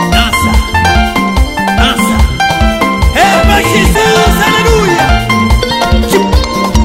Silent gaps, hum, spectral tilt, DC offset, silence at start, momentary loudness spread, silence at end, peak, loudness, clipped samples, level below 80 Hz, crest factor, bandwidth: none; none; -4.5 dB/octave; under 0.1%; 0 s; 4 LU; 0 s; 0 dBFS; -9 LUFS; 0.5%; -14 dBFS; 8 dB; 16.5 kHz